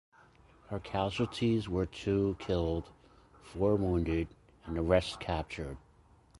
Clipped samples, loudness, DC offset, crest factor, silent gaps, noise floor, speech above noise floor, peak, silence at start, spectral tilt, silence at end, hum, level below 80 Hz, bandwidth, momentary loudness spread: under 0.1%; -33 LUFS; under 0.1%; 20 dB; none; -63 dBFS; 31 dB; -12 dBFS; 0.7 s; -7 dB/octave; 0.6 s; none; -46 dBFS; 11.5 kHz; 13 LU